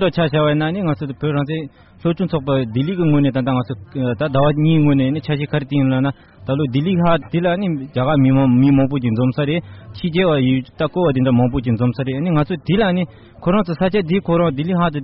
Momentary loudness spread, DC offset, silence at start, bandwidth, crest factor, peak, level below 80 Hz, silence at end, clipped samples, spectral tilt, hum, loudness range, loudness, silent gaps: 8 LU; under 0.1%; 0 s; 5.6 kHz; 12 dB; -4 dBFS; -42 dBFS; 0 s; under 0.1%; -6.5 dB/octave; none; 2 LU; -18 LUFS; none